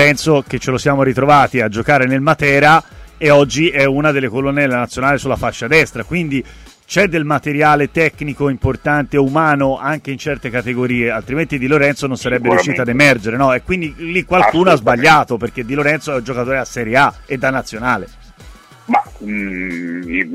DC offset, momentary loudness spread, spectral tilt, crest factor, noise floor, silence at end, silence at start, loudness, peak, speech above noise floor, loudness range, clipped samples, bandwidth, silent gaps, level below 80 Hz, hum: under 0.1%; 9 LU; -5.5 dB/octave; 14 dB; -39 dBFS; 0 s; 0 s; -14 LUFS; 0 dBFS; 25 dB; 5 LU; under 0.1%; 15.5 kHz; none; -38 dBFS; none